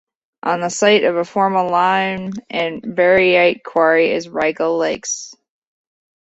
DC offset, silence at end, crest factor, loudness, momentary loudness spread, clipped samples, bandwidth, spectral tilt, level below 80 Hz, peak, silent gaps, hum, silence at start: under 0.1%; 0.9 s; 16 dB; -16 LUFS; 11 LU; under 0.1%; 8.2 kHz; -3.5 dB/octave; -58 dBFS; -2 dBFS; none; none; 0.45 s